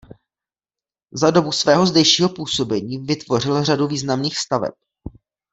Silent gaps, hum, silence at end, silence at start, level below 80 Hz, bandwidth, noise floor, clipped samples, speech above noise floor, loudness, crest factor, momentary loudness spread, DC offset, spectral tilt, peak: none; none; 0.45 s; 1.15 s; -52 dBFS; 8.4 kHz; under -90 dBFS; under 0.1%; over 72 dB; -18 LUFS; 18 dB; 11 LU; under 0.1%; -4.5 dB/octave; -2 dBFS